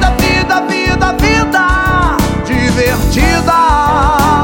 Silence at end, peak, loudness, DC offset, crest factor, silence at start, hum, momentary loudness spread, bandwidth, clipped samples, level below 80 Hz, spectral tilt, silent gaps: 0 s; 0 dBFS; -11 LUFS; under 0.1%; 10 dB; 0 s; none; 3 LU; 17 kHz; under 0.1%; -18 dBFS; -5 dB/octave; none